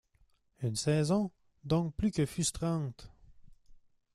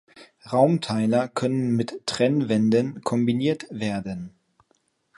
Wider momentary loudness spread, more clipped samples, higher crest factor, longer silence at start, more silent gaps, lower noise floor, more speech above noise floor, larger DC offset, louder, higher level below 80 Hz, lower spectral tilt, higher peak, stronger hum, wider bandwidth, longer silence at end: about the same, 10 LU vs 8 LU; neither; about the same, 18 dB vs 18 dB; first, 0.6 s vs 0.15 s; neither; about the same, -69 dBFS vs -68 dBFS; second, 38 dB vs 46 dB; neither; second, -33 LUFS vs -23 LUFS; first, -54 dBFS vs -62 dBFS; about the same, -5.5 dB/octave vs -6.5 dB/octave; second, -16 dBFS vs -6 dBFS; neither; first, 14 kHz vs 11.5 kHz; second, 0.4 s vs 0.9 s